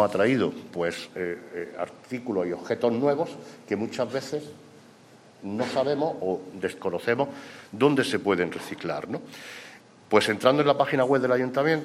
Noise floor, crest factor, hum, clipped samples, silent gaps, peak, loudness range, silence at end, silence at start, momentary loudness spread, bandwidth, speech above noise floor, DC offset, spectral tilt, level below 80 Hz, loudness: -53 dBFS; 22 dB; none; under 0.1%; none; -4 dBFS; 5 LU; 0 s; 0 s; 14 LU; 14.5 kHz; 27 dB; under 0.1%; -5.5 dB/octave; -70 dBFS; -26 LUFS